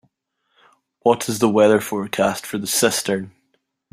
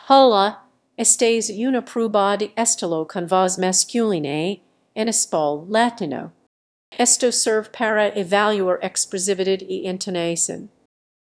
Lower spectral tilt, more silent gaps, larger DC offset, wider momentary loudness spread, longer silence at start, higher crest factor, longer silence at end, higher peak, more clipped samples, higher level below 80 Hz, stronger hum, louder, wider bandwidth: about the same, -3.5 dB/octave vs -2.5 dB/octave; second, none vs 6.46-6.92 s; neither; about the same, 10 LU vs 10 LU; first, 1.05 s vs 0.05 s; about the same, 18 dB vs 20 dB; about the same, 0.65 s vs 0.65 s; about the same, -2 dBFS vs 0 dBFS; neither; first, -60 dBFS vs -72 dBFS; neither; about the same, -19 LUFS vs -19 LUFS; first, 16 kHz vs 11 kHz